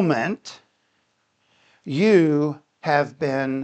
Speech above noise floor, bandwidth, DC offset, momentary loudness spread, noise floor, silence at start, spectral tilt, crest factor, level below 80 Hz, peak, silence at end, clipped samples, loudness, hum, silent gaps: 48 dB; 8.8 kHz; under 0.1%; 16 LU; -68 dBFS; 0 s; -7 dB/octave; 18 dB; -72 dBFS; -4 dBFS; 0 s; under 0.1%; -21 LUFS; none; none